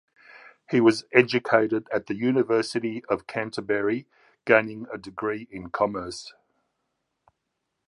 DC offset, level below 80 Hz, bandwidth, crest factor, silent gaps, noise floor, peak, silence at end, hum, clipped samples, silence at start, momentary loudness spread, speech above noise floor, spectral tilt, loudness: under 0.1%; -64 dBFS; 11.5 kHz; 24 dB; none; -80 dBFS; -2 dBFS; 1.6 s; none; under 0.1%; 0.35 s; 14 LU; 56 dB; -5.5 dB/octave; -25 LUFS